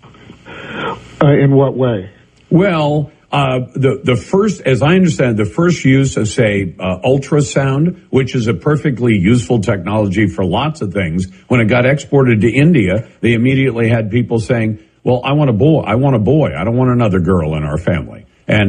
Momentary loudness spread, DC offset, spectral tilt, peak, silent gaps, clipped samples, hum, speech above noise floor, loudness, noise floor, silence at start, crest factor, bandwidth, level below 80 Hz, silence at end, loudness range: 8 LU; under 0.1%; -7 dB/octave; 0 dBFS; none; under 0.1%; none; 25 dB; -14 LUFS; -38 dBFS; 0.45 s; 12 dB; 10 kHz; -42 dBFS; 0 s; 2 LU